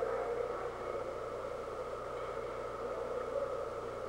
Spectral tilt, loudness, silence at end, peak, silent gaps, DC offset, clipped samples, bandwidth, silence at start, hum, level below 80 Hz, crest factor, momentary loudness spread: -5.5 dB/octave; -40 LUFS; 0 s; -24 dBFS; none; under 0.1%; under 0.1%; 16.5 kHz; 0 s; none; -58 dBFS; 14 dB; 4 LU